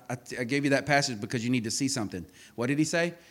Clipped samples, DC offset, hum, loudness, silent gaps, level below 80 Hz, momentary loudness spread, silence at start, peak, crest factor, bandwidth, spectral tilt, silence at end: under 0.1%; under 0.1%; none; -28 LUFS; none; -64 dBFS; 12 LU; 0.1 s; -10 dBFS; 20 dB; 17 kHz; -4 dB/octave; 0.1 s